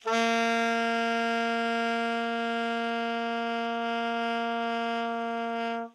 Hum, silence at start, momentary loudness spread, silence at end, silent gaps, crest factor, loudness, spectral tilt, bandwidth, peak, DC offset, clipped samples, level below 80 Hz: none; 0.05 s; 5 LU; 0.05 s; none; 14 dB; -29 LUFS; -3.5 dB/octave; 12 kHz; -14 dBFS; under 0.1%; under 0.1%; under -90 dBFS